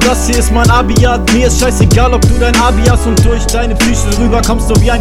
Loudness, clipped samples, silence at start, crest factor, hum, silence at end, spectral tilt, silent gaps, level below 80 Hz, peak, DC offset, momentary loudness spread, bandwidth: -10 LUFS; 1%; 0 s; 8 dB; none; 0 s; -5 dB/octave; none; -12 dBFS; 0 dBFS; under 0.1%; 3 LU; 16 kHz